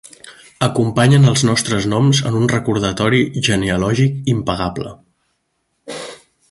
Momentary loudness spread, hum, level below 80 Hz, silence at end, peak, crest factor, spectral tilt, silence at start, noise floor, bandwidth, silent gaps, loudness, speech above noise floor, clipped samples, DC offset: 18 LU; none; -42 dBFS; 0.35 s; 0 dBFS; 16 dB; -5.5 dB/octave; 0.25 s; -69 dBFS; 11.5 kHz; none; -16 LUFS; 54 dB; under 0.1%; under 0.1%